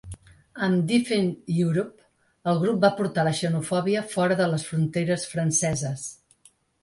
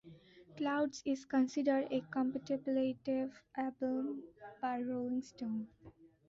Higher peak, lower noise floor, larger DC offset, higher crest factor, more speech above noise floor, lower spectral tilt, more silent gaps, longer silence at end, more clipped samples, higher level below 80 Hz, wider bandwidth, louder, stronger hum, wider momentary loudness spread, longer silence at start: first, -8 dBFS vs -20 dBFS; about the same, -60 dBFS vs -59 dBFS; neither; about the same, 18 dB vs 16 dB; first, 36 dB vs 22 dB; about the same, -5 dB/octave vs -4.5 dB/octave; neither; first, 0.7 s vs 0.2 s; neither; first, -58 dBFS vs -76 dBFS; first, 11.5 kHz vs 7.6 kHz; first, -25 LUFS vs -38 LUFS; neither; about the same, 10 LU vs 9 LU; about the same, 0.05 s vs 0.05 s